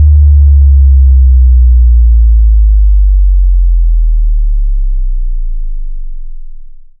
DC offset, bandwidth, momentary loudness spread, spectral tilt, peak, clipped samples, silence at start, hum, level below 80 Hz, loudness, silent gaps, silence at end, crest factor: under 0.1%; 0.2 kHz; 16 LU; -15 dB/octave; 0 dBFS; 0.7%; 0 s; none; -6 dBFS; -9 LUFS; none; 0.2 s; 6 dB